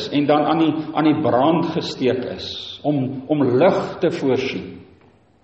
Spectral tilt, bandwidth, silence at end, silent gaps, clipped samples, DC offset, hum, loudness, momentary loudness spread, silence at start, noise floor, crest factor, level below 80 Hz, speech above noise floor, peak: -7 dB/octave; 8 kHz; 0.6 s; none; under 0.1%; under 0.1%; none; -19 LUFS; 10 LU; 0 s; -53 dBFS; 16 dB; -58 dBFS; 34 dB; -4 dBFS